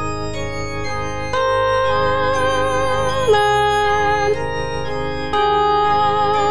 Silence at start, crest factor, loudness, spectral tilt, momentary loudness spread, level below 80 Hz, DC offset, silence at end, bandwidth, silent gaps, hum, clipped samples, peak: 0 s; 14 dB; -18 LUFS; -4.5 dB/octave; 9 LU; -36 dBFS; 4%; 0 s; 10.5 kHz; none; none; under 0.1%; -4 dBFS